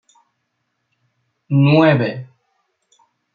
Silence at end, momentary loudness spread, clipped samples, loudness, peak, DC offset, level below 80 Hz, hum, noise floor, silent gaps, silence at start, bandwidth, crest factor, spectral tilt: 1.1 s; 13 LU; under 0.1%; -15 LUFS; -2 dBFS; under 0.1%; -62 dBFS; none; -72 dBFS; none; 1.5 s; 5 kHz; 18 dB; -9 dB/octave